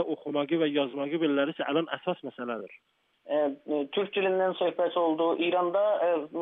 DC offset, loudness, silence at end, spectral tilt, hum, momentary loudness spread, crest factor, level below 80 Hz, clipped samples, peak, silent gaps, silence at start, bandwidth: under 0.1%; -28 LUFS; 0 s; -8.5 dB/octave; none; 9 LU; 14 dB; -88 dBFS; under 0.1%; -14 dBFS; none; 0 s; 4 kHz